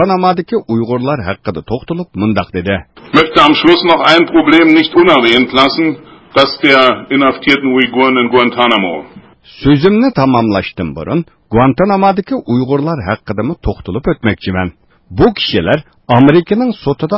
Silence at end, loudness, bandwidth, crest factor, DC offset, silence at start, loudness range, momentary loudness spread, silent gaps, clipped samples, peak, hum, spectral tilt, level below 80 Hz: 0 s; -11 LUFS; 8 kHz; 12 dB; under 0.1%; 0 s; 7 LU; 12 LU; none; 0.3%; 0 dBFS; none; -7 dB/octave; -34 dBFS